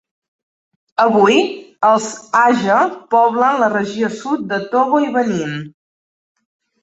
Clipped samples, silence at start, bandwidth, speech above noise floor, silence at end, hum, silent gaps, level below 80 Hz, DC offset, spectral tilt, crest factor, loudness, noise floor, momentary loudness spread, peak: under 0.1%; 1 s; 8.2 kHz; over 75 dB; 1.15 s; none; none; -62 dBFS; under 0.1%; -5 dB/octave; 16 dB; -15 LUFS; under -90 dBFS; 9 LU; -2 dBFS